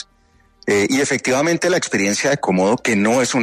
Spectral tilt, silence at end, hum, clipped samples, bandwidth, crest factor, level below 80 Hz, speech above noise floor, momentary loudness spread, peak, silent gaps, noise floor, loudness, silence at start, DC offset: -4 dB/octave; 0 s; none; under 0.1%; 13.5 kHz; 12 dB; -58 dBFS; 39 dB; 2 LU; -6 dBFS; none; -55 dBFS; -17 LUFS; 0.65 s; under 0.1%